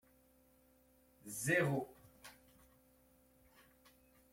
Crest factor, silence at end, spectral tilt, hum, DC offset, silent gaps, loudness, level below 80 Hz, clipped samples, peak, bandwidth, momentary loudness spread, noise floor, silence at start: 24 dB; 2 s; -5 dB/octave; none; under 0.1%; none; -38 LUFS; -76 dBFS; under 0.1%; -20 dBFS; 16.5 kHz; 24 LU; -70 dBFS; 1.25 s